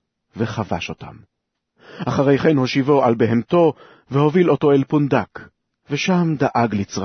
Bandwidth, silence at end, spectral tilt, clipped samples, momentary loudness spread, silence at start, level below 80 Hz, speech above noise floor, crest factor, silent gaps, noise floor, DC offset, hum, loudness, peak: 6.6 kHz; 0 s; -7 dB/octave; under 0.1%; 11 LU; 0.35 s; -54 dBFS; 41 dB; 16 dB; none; -59 dBFS; under 0.1%; none; -18 LUFS; -2 dBFS